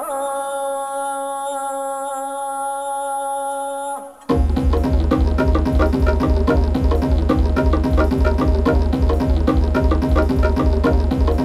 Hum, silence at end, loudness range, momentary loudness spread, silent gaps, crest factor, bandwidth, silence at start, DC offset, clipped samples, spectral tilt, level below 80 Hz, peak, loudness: none; 0 s; 6 LU; 7 LU; none; 14 dB; 12.5 kHz; 0 s; under 0.1%; under 0.1%; -7 dB/octave; -20 dBFS; -4 dBFS; -19 LUFS